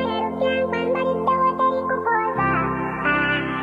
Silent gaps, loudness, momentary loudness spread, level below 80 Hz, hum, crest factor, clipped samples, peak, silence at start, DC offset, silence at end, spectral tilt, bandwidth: none; -21 LUFS; 3 LU; -48 dBFS; none; 14 dB; under 0.1%; -8 dBFS; 0 s; under 0.1%; 0 s; -7.5 dB/octave; 7.2 kHz